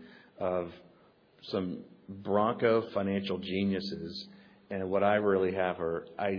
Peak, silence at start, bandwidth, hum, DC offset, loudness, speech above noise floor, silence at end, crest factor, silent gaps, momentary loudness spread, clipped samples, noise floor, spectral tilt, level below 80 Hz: -12 dBFS; 0 s; 5.4 kHz; none; under 0.1%; -31 LUFS; 31 dB; 0 s; 18 dB; none; 16 LU; under 0.1%; -62 dBFS; -5 dB/octave; -68 dBFS